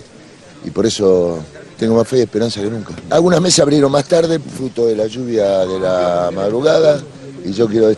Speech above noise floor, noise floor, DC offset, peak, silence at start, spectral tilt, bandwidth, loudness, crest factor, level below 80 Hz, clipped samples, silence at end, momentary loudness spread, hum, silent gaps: 26 dB; -40 dBFS; under 0.1%; 0 dBFS; 0 s; -5 dB/octave; 11.5 kHz; -15 LUFS; 14 dB; -48 dBFS; under 0.1%; 0 s; 13 LU; none; none